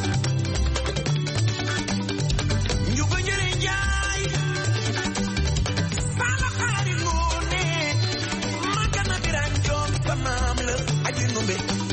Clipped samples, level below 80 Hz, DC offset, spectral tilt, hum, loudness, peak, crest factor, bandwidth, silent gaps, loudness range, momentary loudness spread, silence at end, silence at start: under 0.1%; -32 dBFS; under 0.1%; -4 dB/octave; none; -24 LUFS; -10 dBFS; 14 dB; 8.8 kHz; none; 0 LU; 2 LU; 0 s; 0 s